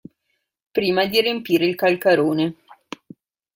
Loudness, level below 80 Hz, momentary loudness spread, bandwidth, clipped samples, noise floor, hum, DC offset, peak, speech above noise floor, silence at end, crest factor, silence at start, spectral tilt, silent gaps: -19 LUFS; -64 dBFS; 21 LU; 17 kHz; under 0.1%; -74 dBFS; none; under 0.1%; -4 dBFS; 55 dB; 1.05 s; 18 dB; 0.75 s; -5.5 dB/octave; none